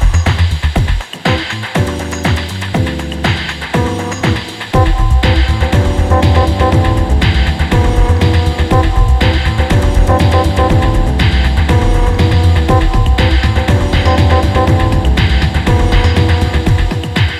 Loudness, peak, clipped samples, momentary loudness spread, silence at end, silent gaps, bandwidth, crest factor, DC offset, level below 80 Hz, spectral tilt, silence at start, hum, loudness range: -12 LUFS; 0 dBFS; under 0.1%; 5 LU; 0 s; none; 13 kHz; 10 dB; under 0.1%; -14 dBFS; -6 dB/octave; 0 s; none; 4 LU